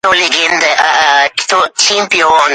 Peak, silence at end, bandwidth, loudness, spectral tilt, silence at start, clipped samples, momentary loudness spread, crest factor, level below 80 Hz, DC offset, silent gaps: 0 dBFS; 0 s; 11.5 kHz; -9 LUFS; 0 dB/octave; 0.05 s; under 0.1%; 3 LU; 10 dB; -50 dBFS; under 0.1%; none